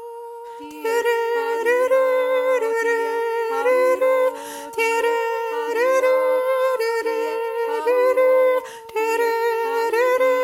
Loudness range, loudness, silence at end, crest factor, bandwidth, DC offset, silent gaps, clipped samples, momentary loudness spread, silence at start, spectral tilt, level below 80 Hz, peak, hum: 1 LU; -20 LUFS; 0 s; 12 dB; 16.5 kHz; under 0.1%; none; under 0.1%; 7 LU; 0 s; -1 dB/octave; -74 dBFS; -6 dBFS; none